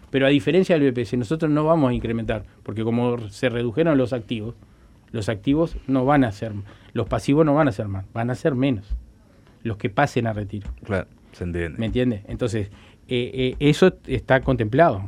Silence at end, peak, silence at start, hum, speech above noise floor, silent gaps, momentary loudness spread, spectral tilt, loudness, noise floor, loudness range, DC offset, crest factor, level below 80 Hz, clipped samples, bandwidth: 0 s; -2 dBFS; 0.15 s; none; 30 dB; none; 14 LU; -7 dB/octave; -22 LUFS; -52 dBFS; 4 LU; under 0.1%; 20 dB; -42 dBFS; under 0.1%; 12 kHz